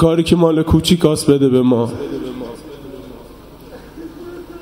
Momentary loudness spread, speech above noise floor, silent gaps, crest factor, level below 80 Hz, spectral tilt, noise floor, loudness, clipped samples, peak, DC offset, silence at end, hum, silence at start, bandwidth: 21 LU; 25 dB; none; 16 dB; -36 dBFS; -6.5 dB/octave; -38 dBFS; -14 LUFS; under 0.1%; 0 dBFS; under 0.1%; 0 s; none; 0 s; 16 kHz